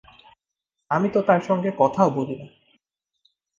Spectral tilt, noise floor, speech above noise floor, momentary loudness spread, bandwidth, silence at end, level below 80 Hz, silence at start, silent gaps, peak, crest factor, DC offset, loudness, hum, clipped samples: -8 dB/octave; -83 dBFS; 62 dB; 10 LU; 7.4 kHz; 1.1 s; -66 dBFS; 0.9 s; none; -4 dBFS; 20 dB; under 0.1%; -22 LUFS; none; under 0.1%